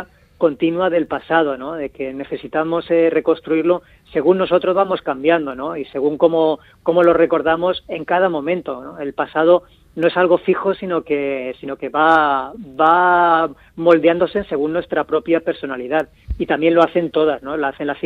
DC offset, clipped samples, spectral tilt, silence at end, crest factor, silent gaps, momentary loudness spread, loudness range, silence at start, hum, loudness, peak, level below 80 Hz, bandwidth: under 0.1%; under 0.1%; -8 dB/octave; 0.05 s; 16 dB; none; 12 LU; 3 LU; 0 s; none; -17 LUFS; 0 dBFS; -46 dBFS; 4.7 kHz